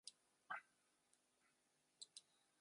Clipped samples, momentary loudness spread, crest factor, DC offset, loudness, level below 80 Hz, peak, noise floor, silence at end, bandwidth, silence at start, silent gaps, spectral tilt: under 0.1%; 8 LU; 26 dB; under 0.1%; -58 LUFS; under -90 dBFS; -38 dBFS; -84 dBFS; 0.4 s; 11.5 kHz; 0.05 s; none; 1 dB/octave